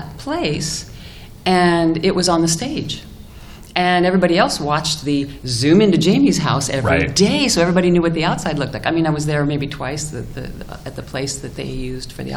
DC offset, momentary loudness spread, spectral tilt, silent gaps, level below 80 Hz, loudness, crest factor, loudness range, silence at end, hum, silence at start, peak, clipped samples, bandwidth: under 0.1%; 14 LU; -4.5 dB/octave; none; -38 dBFS; -17 LUFS; 16 dB; 7 LU; 0 s; none; 0 s; -2 dBFS; under 0.1%; 15 kHz